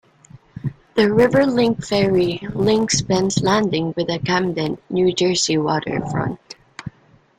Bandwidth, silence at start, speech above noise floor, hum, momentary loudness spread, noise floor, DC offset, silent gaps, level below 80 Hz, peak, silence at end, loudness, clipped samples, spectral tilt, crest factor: 13.5 kHz; 0.35 s; 34 dB; none; 15 LU; -52 dBFS; under 0.1%; none; -48 dBFS; -2 dBFS; 0.5 s; -19 LUFS; under 0.1%; -5 dB/octave; 16 dB